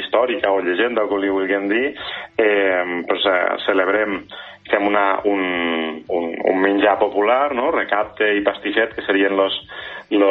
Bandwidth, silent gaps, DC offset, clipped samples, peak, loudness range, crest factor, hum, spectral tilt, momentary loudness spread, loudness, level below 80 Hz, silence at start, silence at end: 4.7 kHz; none; under 0.1%; under 0.1%; -2 dBFS; 1 LU; 16 dB; none; -7 dB/octave; 7 LU; -19 LUFS; -56 dBFS; 0 s; 0 s